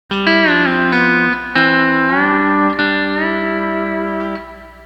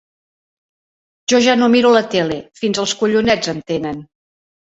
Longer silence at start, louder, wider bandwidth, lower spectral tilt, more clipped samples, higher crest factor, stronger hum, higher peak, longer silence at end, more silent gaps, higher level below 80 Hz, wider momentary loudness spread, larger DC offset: second, 0.1 s vs 1.3 s; about the same, -14 LUFS vs -15 LUFS; about the same, 8.2 kHz vs 8 kHz; first, -6.5 dB/octave vs -4 dB/octave; neither; about the same, 14 dB vs 16 dB; neither; about the same, 0 dBFS vs -2 dBFS; second, 0 s vs 0.65 s; neither; first, -44 dBFS vs -54 dBFS; about the same, 9 LU vs 10 LU; neither